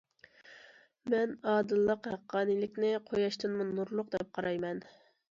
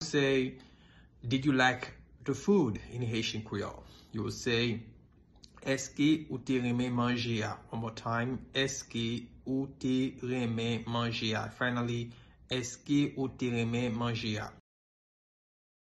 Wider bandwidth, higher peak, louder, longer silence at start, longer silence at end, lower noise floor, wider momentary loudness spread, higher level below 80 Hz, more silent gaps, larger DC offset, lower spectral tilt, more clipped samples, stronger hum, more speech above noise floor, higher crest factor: second, 7.6 kHz vs 12 kHz; second, -18 dBFS vs -14 dBFS; about the same, -33 LUFS vs -33 LUFS; first, 0.5 s vs 0 s; second, 0.45 s vs 1.3 s; about the same, -59 dBFS vs -60 dBFS; second, 7 LU vs 11 LU; second, -72 dBFS vs -60 dBFS; neither; neither; first, -6.5 dB/octave vs -5 dB/octave; neither; neither; about the same, 27 dB vs 28 dB; about the same, 16 dB vs 20 dB